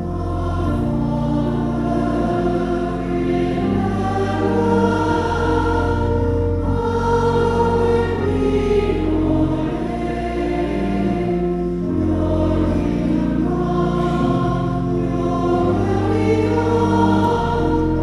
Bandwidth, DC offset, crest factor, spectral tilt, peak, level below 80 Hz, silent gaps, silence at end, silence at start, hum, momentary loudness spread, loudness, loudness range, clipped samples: 11.5 kHz; under 0.1%; 14 dB; -8 dB/octave; -4 dBFS; -30 dBFS; none; 0 s; 0 s; none; 4 LU; -19 LUFS; 2 LU; under 0.1%